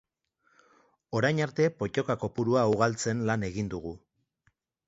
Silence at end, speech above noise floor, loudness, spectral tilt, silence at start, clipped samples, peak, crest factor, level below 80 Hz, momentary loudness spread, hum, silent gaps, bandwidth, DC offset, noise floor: 0.9 s; 45 dB; -29 LUFS; -6 dB/octave; 1.1 s; under 0.1%; -8 dBFS; 22 dB; -58 dBFS; 10 LU; none; none; 8 kHz; under 0.1%; -73 dBFS